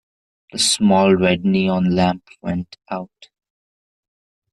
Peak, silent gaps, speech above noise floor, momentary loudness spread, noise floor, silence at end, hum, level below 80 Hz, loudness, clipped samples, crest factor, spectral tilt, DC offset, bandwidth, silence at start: -4 dBFS; none; over 72 dB; 16 LU; under -90 dBFS; 1.5 s; none; -56 dBFS; -17 LUFS; under 0.1%; 16 dB; -4.5 dB/octave; under 0.1%; 12 kHz; 0.55 s